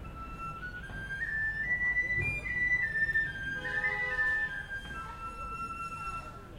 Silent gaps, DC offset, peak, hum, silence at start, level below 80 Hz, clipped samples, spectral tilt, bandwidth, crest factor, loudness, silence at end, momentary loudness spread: none; under 0.1%; -20 dBFS; none; 0 s; -48 dBFS; under 0.1%; -4.5 dB/octave; 16 kHz; 14 dB; -32 LUFS; 0 s; 13 LU